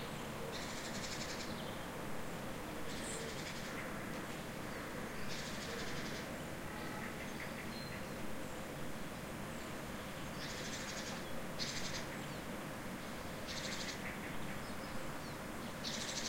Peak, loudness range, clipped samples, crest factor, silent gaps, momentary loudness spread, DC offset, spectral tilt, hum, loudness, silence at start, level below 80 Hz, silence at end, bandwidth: -26 dBFS; 2 LU; under 0.1%; 18 dB; none; 4 LU; under 0.1%; -3.5 dB/octave; none; -44 LUFS; 0 s; -58 dBFS; 0 s; 16.5 kHz